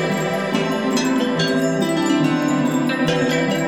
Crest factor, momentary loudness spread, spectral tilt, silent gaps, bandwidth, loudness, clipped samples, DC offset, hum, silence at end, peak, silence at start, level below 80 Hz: 12 dB; 3 LU; -5 dB/octave; none; 18 kHz; -19 LUFS; under 0.1%; 0.2%; none; 0 s; -6 dBFS; 0 s; -56 dBFS